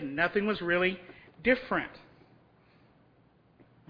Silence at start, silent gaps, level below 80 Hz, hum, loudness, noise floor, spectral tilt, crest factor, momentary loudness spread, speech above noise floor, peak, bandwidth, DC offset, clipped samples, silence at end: 0 s; none; -60 dBFS; none; -29 LUFS; -64 dBFS; -8 dB/octave; 22 dB; 16 LU; 35 dB; -10 dBFS; 5.2 kHz; under 0.1%; under 0.1%; 1.9 s